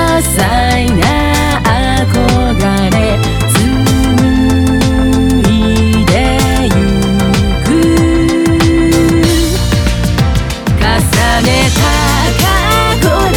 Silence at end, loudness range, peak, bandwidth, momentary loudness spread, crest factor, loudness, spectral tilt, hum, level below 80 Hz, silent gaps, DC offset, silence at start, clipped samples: 0 s; 1 LU; 0 dBFS; 20 kHz; 3 LU; 10 dB; -10 LUFS; -5 dB/octave; none; -18 dBFS; none; under 0.1%; 0 s; under 0.1%